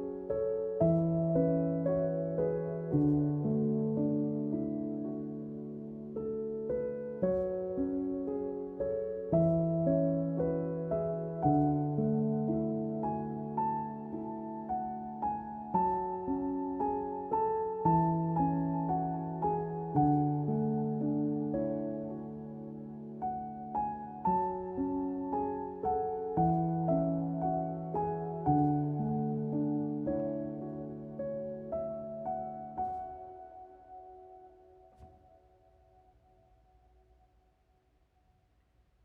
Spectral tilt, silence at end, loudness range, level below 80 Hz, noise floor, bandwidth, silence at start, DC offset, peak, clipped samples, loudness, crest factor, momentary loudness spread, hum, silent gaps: -13 dB/octave; 3.95 s; 7 LU; -58 dBFS; -71 dBFS; 2.8 kHz; 0 s; under 0.1%; -14 dBFS; under 0.1%; -33 LUFS; 18 dB; 11 LU; none; none